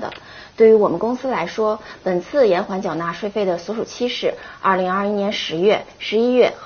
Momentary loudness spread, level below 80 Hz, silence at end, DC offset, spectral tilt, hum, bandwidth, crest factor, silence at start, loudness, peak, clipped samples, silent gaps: 9 LU; -56 dBFS; 0 s; under 0.1%; -3.5 dB/octave; none; 6.8 kHz; 16 dB; 0 s; -19 LUFS; -2 dBFS; under 0.1%; none